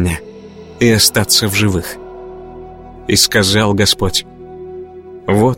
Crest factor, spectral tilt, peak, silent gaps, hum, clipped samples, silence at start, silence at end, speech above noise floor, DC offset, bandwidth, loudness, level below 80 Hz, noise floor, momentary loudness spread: 16 dB; -3.5 dB/octave; 0 dBFS; none; none; under 0.1%; 0 s; 0 s; 21 dB; under 0.1%; 16.5 kHz; -12 LUFS; -36 dBFS; -34 dBFS; 23 LU